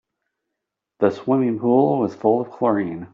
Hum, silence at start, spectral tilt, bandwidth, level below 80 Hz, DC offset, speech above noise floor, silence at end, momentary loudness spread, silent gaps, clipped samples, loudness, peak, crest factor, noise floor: none; 1 s; -8 dB/octave; 7 kHz; -66 dBFS; under 0.1%; 63 dB; 0.05 s; 5 LU; none; under 0.1%; -20 LUFS; -4 dBFS; 18 dB; -82 dBFS